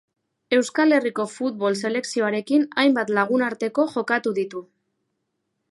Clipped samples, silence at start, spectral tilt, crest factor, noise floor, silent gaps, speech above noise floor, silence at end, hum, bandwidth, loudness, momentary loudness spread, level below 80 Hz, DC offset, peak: under 0.1%; 0.5 s; -4.5 dB/octave; 18 dB; -76 dBFS; none; 55 dB; 1.05 s; none; 11.5 kHz; -22 LUFS; 8 LU; -76 dBFS; under 0.1%; -4 dBFS